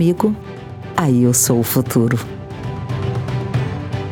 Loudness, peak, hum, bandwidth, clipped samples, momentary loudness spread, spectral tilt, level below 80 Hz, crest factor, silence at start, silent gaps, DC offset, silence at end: -18 LUFS; -2 dBFS; none; 19 kHz; under 0.1%; 14 LU; -5.5 dB/octave; -42 dBFS; 16 dB; 0 s; none; under 0.1%; 0 s